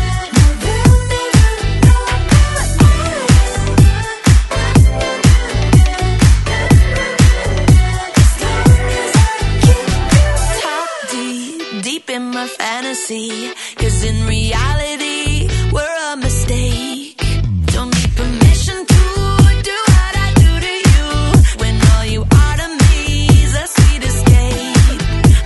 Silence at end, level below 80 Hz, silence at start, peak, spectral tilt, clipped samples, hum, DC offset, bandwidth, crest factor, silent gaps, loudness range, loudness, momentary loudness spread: 0 s; -16 dBFS; 0 s; 0 dBFS; -5 dB/octave; under 0.1%; none; under 0.1%; 12 kHz; 12 dB; none; 6 LU; -13 LUFS; 9 LU